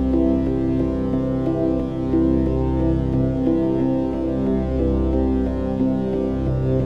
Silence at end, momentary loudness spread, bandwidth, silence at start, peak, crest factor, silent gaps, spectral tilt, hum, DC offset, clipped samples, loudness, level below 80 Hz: 0 s; 3 LU; 6 kHz; 0 s; -6 dBFS; 14 dB; none; -10.5 dB/octave; none; 0.9%; under 0.1%; -21 LUFS; -28 dBFS